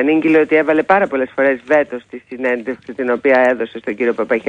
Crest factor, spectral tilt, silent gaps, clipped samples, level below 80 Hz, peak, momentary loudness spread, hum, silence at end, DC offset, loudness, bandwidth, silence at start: 16 dB; -7 dB/octave; none; under 0.1%; -58 dBFS; 0 dBFS; 11 LU; none; 0 s; under 0.1%; -15 LUFS; 9 kHz; 0 s